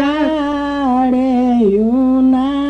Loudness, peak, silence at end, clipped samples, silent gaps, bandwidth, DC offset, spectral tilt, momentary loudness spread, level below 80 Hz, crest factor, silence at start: -14 LUFS; -4 dBFS; 0 s; under 0.1%; none; 6.4 kHz; under 0.1%; -7 dB/octave; 5 LU; -40 dBFS; 10 dB; 0 s